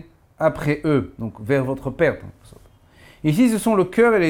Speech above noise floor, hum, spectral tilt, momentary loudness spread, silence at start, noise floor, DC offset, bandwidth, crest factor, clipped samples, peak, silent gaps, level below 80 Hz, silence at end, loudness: 30 dB; none; -6.5 dB/octave; 9 LU; 0.4 s; -50 dBFS; under 0.1%; 18.5 kHz; 18 dB; under 0.1%; -4 dBFS; none; -48 dBFS; 0 s; -20 LUFS